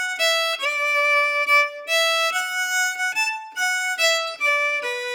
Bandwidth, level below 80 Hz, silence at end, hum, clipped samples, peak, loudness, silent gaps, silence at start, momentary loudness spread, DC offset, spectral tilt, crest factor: over 20 kHz; under -90 dBFS; 0 s; none; under 0.1%; -6 dBFS; -19 LUFS; none; 0 s; 6 LU; under 0.1%; 4.5 dB/octave; 16 dB